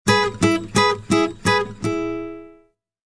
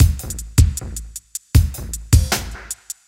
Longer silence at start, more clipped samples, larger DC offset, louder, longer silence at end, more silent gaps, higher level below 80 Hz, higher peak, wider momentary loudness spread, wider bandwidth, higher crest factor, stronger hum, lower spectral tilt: about the same, 0.05 s vs 0 s; neither; neither; about the same, -20 LUFS vs -19 LUFS; first, 0.6 s vs 0.15 s; neither; second, -46 dBFS vs -22 dBFS; about the same, -2 dBFS vs 0 dBFS; about the same, 12 LU vs 14 LU; second, 11 kHz vs 17 kHz; about the same, 18 dB vs 18 dB; neither; about the same, -4.5 dB/octave vs -4.5 dB/octave